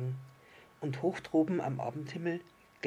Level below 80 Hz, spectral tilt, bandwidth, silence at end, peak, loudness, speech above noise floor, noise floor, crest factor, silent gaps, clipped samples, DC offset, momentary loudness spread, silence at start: -74 dBFS; -7.5 dB/octave; 11 kHz; 0 s; -18 dBFS; -35 LUFS; 25 dB; -59 dBFS; 18 dB; none; under 0.1%; under 0.1%; 12 LU; 0 s